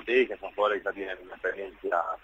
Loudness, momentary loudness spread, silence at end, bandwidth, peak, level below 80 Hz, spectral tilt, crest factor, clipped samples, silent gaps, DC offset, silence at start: -30 LUFS; 11 LU; 0.05 s; 7.2 kHz; -12 dBFS; -62 dBFS; -5 dB/octave; 18 dB; under 0.1%; none; under 0.1%; 0 s